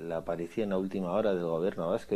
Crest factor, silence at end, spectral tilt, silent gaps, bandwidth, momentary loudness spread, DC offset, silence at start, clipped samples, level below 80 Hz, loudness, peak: 14 dB; 0 s; -7.5 dB/octave; none; 14 kHz; 5 LU; under 0.1%; 0 s; under 0.1%; -60 dBFS; -32 LUFS; -16 dBFS